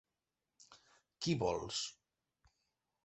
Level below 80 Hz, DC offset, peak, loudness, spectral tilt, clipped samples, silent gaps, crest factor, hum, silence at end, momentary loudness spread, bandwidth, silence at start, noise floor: -66 dBFS; under 0.1%; -22 dBFS; -39 LUFS; -4.5 dB/octave; under 0.1%; none; 22 dB; none; 1.15 s; 7 LU; 8.2 kHz; 0.6 s; under -90 dBFS